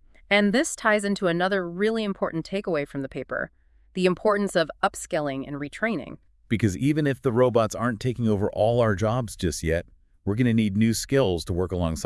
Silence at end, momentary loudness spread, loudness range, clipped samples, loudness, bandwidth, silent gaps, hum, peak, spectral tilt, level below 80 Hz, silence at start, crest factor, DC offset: 0 s; 9 LU; 3 LU; under 0.1%; -25 LUFS; 12 kHz; none; none; -4 dBFS; -5.5 dB/octave; -48 dBFS; 0.3 s; 20 dB; under 0.1%